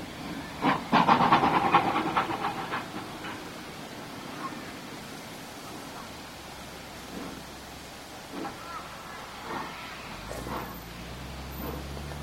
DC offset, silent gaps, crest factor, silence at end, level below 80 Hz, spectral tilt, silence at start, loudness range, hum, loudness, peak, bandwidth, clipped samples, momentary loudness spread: under 0.1%; none; 26 dB; 0 s; -50 dBFS; -4.5 dB/octave; 0 s; 15 LU; none; -31 LUFS; -6 dBFS; 16 kHz; under 0.1%; 19 LU